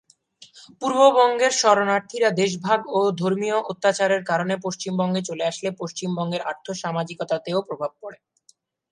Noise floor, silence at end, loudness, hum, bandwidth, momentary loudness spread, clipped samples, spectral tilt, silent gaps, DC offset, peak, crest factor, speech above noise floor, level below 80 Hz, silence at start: -61 dBFS; 0.75 s; -22 LUFS; none; 11 kHz; 12 LU; under 0.1%; -4 dB/octave; none; under 0.1%; -2 dBFS; 20 dB; 39 dB; -72 dBFS; 0.4 s